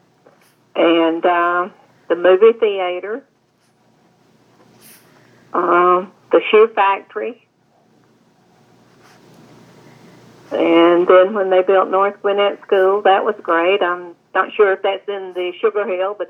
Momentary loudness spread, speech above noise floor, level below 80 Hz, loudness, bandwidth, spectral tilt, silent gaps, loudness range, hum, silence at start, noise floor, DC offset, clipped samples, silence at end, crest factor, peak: 14 LU; 44 dB; -80 dBFS; -15 LUFS; 11 kHz; -6 dB/octave; none; 8 LU; none; 0.75 s; -59 dBFS; under 0.1%; under 0.1%; 0.05 s; 18 dB; 0 dBFS